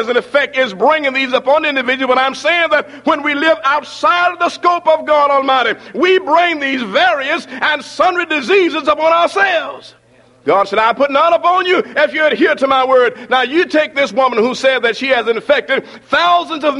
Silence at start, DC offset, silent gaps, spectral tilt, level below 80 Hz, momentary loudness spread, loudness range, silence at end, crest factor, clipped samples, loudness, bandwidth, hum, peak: 0 s; under 0.1%; none; -3.5 dB/octave; -58 dBFS; 4 LU; 1 LU; 0 s; 12 dB; under 0.1%; -13 LUFS; 11.5 kHz; none; 0 dBFS